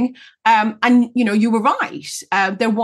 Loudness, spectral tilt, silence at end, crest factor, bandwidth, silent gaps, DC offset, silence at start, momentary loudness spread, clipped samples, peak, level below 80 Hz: -17 LUFS; -4.5 dB/octave; 0 s; 16 dB; 12.5 kHz; none; under 0.1%; 0 s; 8 LU; under 0.1%; -2 dBFS; -72 dBFS